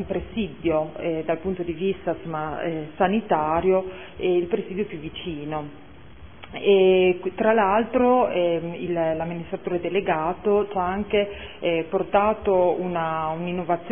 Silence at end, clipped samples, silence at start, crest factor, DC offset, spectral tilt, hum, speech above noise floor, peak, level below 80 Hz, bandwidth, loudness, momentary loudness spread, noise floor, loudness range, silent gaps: 0 s; under 0.1%; 0 s; 18 dB; 0.5%; -10.5 dB/octave; none; 22 dB; -6 dBFS; -50 dBFS; 3.6 kHz; -23 LUFS; 10 LU; -45 dBFS; 5 LU; none